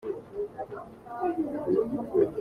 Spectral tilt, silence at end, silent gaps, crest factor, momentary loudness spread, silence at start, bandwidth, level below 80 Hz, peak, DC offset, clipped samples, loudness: -9 dB/octave; 0 s; none; 18 dB; 13 LU; 0 s; 9.8 kHz; -60 dBFS; -12 dBFS; under 0.1%; under 0.1%; -31 LUFS